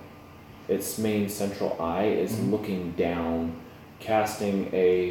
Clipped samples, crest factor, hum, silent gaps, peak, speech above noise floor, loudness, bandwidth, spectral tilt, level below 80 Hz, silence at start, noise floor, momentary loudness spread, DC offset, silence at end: under 0.1%; 16 dB; none; none; -10 dBFS; 21 dB; -27 LUFS; 19 kHz; -5.5 dB/octave; -56 dBFS; 0 s; -47 dBFS; 18 LU; under 0.1%; 0 s